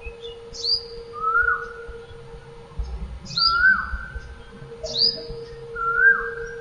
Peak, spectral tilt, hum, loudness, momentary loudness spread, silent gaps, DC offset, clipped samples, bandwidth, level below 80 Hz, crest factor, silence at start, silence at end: -6 dBFS; -2.5 dB/octave; none; -20 LUFS; 25 LU; none; under 0.1%; under 0.1%; 10.5 kHz; -40 dBFS; 18 dB; 0 s; 0 s